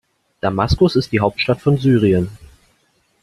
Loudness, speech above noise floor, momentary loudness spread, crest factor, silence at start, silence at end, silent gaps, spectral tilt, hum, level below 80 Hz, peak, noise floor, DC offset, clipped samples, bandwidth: -17 LUFS; 46 dB; 8 LU; 16 dB; 0.45 s; 0.85 s; none; -7.5 dB/octave; none; -36 dBFS; -2 dBFS; -61 dBFS; under 0.1%; under 0.1%; 12.5 kHz